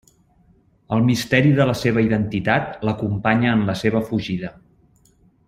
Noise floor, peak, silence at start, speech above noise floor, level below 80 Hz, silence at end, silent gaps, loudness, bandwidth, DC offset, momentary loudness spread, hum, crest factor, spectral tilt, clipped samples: -57 dBFS; -2 dBFS; 0.9 s; 38 dB; -48 dBFS; 0.95 s; none; -20 LUFS; 15.5 kHz; under 0.1%; 8 LU; none; 18 dB; -6.5 dB/octave; under 0.1%